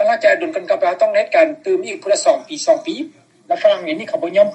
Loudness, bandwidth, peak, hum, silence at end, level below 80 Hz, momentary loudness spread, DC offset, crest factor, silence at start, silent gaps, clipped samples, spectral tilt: -17 LUFS; 8.8 kHz; 0 dBFS; none; 0 s; -80 dBFS; 8 LU; under 0.1%; 16 dB; 0 s; none; under 0.1%; -3 dB/octave